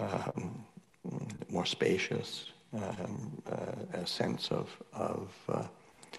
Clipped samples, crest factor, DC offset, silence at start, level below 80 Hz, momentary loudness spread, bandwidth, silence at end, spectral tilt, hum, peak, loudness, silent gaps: under 0.1%; 20 dB; under 0.1%; 0 s; -72 dBFS; 13 LU; 12.5 kHz; 0 s; -5 dB/octave; none; -18 dBFS; -37 LUFS; none